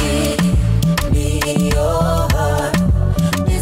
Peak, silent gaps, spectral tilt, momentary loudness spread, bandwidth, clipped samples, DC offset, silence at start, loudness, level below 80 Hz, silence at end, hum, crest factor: -6 dBFS; none; -6 dB/octave; 1 LU; 16.5 kHz; under 0.1%; under 0.1%; 0 s; -16 LUFS; -22 dBFS; 0 s; none; 8 dB